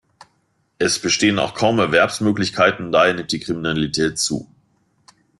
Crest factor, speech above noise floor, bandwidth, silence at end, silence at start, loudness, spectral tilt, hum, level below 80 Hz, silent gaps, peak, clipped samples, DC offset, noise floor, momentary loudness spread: 18 dB; 47 dB; 12.5 kHz; 0.95 s; 0.8 s; -18 LUFS; -3.5 dB/octave; none; -52 dBFS; none; -2 dBFS; under 0.1%; under 0.1%; -65 dBFS; 7 LU